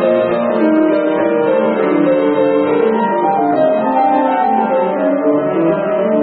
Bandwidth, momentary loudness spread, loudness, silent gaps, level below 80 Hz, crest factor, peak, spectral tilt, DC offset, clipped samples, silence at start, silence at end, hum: 4.5 kHz; 2 LU; -14 LUFS; none; -58 dBFS; 12 dB; -2 dBFS; -12 dB/octave; under 0.1%; under 0.1%; 0 s; 0 s; none